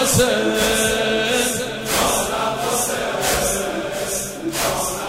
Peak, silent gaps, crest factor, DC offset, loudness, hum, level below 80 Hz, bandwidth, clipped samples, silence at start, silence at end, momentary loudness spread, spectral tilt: -4 dBFS; none; 16 dB; under 0.1%; -19 LUFS; none; -40 dBFS; 16.5 kHz; under 0.1%; 0 s; 0 s; 7 LU; -2.5 dB/octave